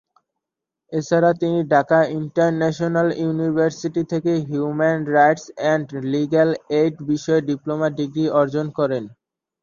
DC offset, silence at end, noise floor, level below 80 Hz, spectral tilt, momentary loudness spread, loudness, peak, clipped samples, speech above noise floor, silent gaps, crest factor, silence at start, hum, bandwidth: under 0.1%; 0.55 s; -85 dBFS; -62 dBFS; -7 dB/octave; 7 LU; -20 LUFS; -2 dBFS; under 0.1%; 65 dB; none; 18 dB; 0.9 s; none; 7.4 kHz